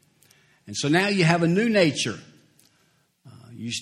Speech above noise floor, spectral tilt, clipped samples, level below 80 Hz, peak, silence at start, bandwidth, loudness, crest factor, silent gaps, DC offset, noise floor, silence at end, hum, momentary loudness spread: 44 dB; -5 dB/octave; under 0.1%; -64 dBFS; -4 dBFS; 0.65 s; 13 kHz; -22 LUFS; 22 dB; none; under 0.1%; -65 dBFS; 0 s; none; 15 LU